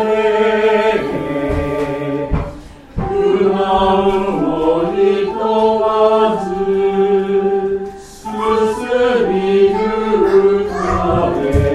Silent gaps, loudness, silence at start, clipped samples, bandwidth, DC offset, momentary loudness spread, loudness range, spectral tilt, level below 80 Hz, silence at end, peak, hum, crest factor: none; -15 LUFS; 0 s; under 0.1%; 11.5 kHz; under 0.1%; 8 LU; 3 LU; -7 dB/octave; -32 dBFS; 0 s; 0 dBFS; none; 14 dB